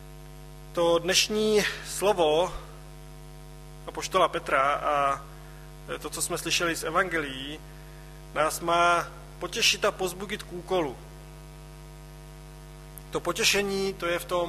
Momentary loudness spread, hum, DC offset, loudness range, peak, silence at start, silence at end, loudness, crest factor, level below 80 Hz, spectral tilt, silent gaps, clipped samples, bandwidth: 23 LU; none; under 0.1%; 4 LU; -8 dBFS; 0 s; 0 s; -26 LUFS; 20 dB; -48 dBFS; -2.5 dB/octave; none; under 0.1%; 14.5 kHz